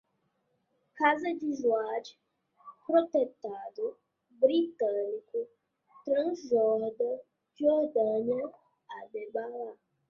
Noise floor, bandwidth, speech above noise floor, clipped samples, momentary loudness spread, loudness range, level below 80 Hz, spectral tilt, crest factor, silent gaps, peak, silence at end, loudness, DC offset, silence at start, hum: -77 dBFS; 7.2 kHz; 47 dB; under 0.1%; 15 LU; 2 LU; -78 dBFS; -5.5 dB/octave; 20 dB; none; -10 dBFS; 0.35 s; -30 LUFS; under 0.1%; 0.95 s; none